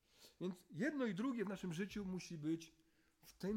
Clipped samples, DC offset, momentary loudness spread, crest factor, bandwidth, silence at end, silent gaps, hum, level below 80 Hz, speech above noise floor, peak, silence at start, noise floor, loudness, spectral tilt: under 0.1%; under 0.1%; 8 LU; 16 dB; 16.5 kHz; 0 s; none; none; -74 dBFS; 25 dB; -28 dBFS; 0.2 s; -69 dBFS; -45 LUFS; -6 dB/octave